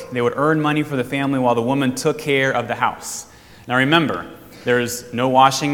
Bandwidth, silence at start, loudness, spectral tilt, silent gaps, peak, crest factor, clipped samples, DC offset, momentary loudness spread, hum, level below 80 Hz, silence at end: 18.5 kHz; 0 s; -19 LUFS; -4.5 dB/octave; none; 0 dBFS; 18 dB; under 0.1%; under 0.1%; 13 LU; none; -56 dBFS; 0 s